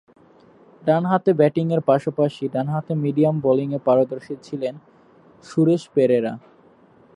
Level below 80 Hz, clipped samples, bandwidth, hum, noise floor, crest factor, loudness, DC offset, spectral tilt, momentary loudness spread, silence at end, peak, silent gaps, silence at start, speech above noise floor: -66 dBFS; under 0.1%; 11 kHz; none; -53 dBFS; 18 dB; -21 LUFS; under 0.1%; -8.5 dB/octave; 10 LU; 0.75 s; -4 dBFS; none; 0.85 s; 33 dB